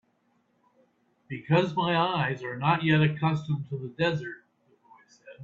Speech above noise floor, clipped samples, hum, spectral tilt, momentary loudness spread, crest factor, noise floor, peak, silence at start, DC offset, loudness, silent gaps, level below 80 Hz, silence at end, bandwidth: 44 dB; under 0.1%; none; -7.5 dB/octave; 16 LU; 20 dB; -70 dBFS; -10 dBFS; 1.3 s; under 0.1%; -27 LUFS; none; -66 dBFS; 0 s; 7.2 kHz